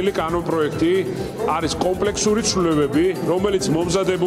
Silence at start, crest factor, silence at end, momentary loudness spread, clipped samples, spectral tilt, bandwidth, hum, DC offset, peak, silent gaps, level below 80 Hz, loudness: 0 s; 12 dB; 0 s; 4 LU; under 0.1%; -4.5 dB/octave; 15.5 kHz; none; under 0.1%; -6 dBFS; none; -42 dBFS; -20 LUFS